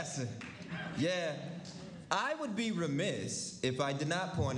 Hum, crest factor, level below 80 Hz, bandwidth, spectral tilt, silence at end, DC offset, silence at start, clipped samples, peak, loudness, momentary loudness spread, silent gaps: none; 22 dB; -64 dBFS; 11.5 kHz; -4.5 dB/octave; 0 s; under 0.1%; 0 s; under 0.1%; -14 dBFS; -36 LUFS; 11 LU; none